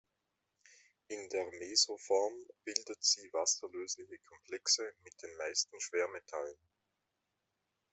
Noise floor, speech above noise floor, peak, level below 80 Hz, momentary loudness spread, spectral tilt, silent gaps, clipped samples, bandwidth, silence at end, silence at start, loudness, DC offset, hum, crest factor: -86 dBFS; 48 dB; -12 dBFS; -86 dBFS; 16 LU; 1 dB/octave; none; under 0.1%; 8.4 kHz; 1.4 s; 1.1 s; -35 LUFS; under 0.1%; none; 28 dB